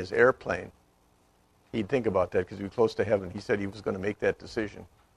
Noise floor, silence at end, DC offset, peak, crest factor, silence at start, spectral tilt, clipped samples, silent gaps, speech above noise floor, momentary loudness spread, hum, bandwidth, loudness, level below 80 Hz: -65 dBFS; 0.3 s; under 0.1%; -8 dBFS; 22 dB; 0 s; -6.5 dB/octave; under 0.1%; none; 36 dB; 12 LU; none; 11 kHz; -29 LUFS; -58 dBFS